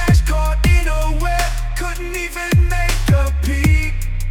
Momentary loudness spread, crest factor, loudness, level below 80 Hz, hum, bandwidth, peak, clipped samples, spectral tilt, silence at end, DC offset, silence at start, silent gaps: 8 LU; 12 dB; -18 LUFS; -18 dBFS; none; 18 kHz; -4 dBFS; under 0.1%; -5.5 dB/octave; 0 s; under 0.1%; 0 s; none